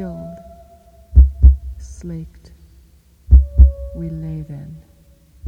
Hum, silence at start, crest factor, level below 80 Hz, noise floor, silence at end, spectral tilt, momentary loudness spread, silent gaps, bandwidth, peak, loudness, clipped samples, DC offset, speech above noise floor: none; 0 s; 16 dB; -16 dBFS; -50 dBFS; 0 s; -10 dB/octave; 22 LU; none; 1.5 kHz; 0 dBFS; -16 LUFS; 0.3%; under 0.1%; 22 dB